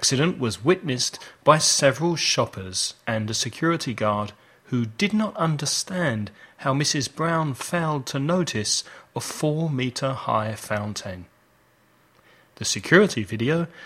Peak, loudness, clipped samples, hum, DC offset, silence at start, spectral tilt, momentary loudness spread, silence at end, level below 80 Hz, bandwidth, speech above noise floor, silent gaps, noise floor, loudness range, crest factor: 0 dBFS; -23 LUFS; under 0.1%; none; under 0.1%; 0 s; -4 dB/octave; 11 LU; 0 s; -60 dBFS; 16 kHz; 37 dB; none; -60 dBFS; 6 LU; 24 dB